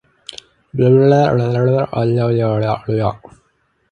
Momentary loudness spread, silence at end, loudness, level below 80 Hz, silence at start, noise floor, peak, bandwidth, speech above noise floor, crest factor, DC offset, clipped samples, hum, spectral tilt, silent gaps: 17 LU; 0.75 s; -15 LUFS; -48 dBFS; 0.75 s; -62 dBFS; 0 dBFS; 8.6 kHz; 48 dB; 16 dB; under 0.1%; under 0.1%; none; -8.5 dB/octave; none